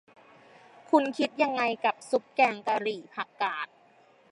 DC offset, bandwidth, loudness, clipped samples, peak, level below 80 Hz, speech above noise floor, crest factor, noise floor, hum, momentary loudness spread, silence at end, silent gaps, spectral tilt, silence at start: under 0.1%; 11.5 kHz; -28 LUFS; under 0.1%; -8 dBFS; -86 dBFS; 32 dB; 22 dB; -60 dBFS; none; 11 LU; 0.65 s; none; -4 dB/octave; 0.9 s